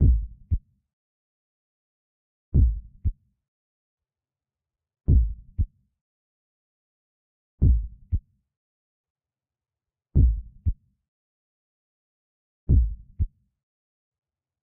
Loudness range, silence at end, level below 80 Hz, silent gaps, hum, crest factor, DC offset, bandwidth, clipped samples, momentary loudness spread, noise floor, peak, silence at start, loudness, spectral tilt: 3 LU; 1.35 s; -28 dBFS; 0.93-2.52 s, 3.48-3.98 s, 6.01-7.58 s, 8.57-9.04 s, 9.10-9.15 s, 11.08-12.67 s; none; 20 dB; under 0.1%; 0.9 kHz; under 0.1%; 10 LU; under -90 dBFS; -8 dBFS; 0 s; -27 LUFS; -18 dB/octave